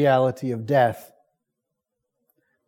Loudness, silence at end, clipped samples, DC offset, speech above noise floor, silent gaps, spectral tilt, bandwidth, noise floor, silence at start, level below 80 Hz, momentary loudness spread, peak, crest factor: -22 LUFS; 1.6 s; under 0.1%; under 0.1%; 61 dB; none; -7.5 dB/octave; 17.5 kHz; -82 dBFS; 0 s; -72 dBFS; 11 LU; -8 dBFS; 18 dB